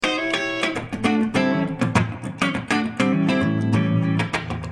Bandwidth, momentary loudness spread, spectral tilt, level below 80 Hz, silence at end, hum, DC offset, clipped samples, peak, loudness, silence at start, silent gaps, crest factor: 12 kHz; 4 LU; -6 dB/octave; -50 dBFS; 0 s; none; under 0.1%; under 0.1%; -4 dBFS; -22 LUFS; 0 s; none; 18 dB